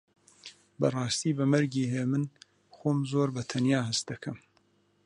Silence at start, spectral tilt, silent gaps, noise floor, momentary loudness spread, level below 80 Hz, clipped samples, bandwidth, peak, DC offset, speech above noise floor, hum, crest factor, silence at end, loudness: 0.45 s; -5.5 dB/octave; none; -68 dBFS; 21 LU; -68 dBFS; under 0.1%; 11 kHz; -12 dBFS; under 0.1%; 40 dB; none; 18 dB; 0.7 s; -29 LUFS